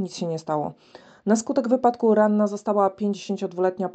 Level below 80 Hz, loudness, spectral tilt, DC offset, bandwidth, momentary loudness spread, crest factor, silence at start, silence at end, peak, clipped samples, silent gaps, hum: -70 dBFS; -23 LUFS; -6 dB/octave; under 0.1%; 9 kHz; 10 LU; 18 dB; 0 s; 0.05 s; -6 dBFS; under 0.1%; none; none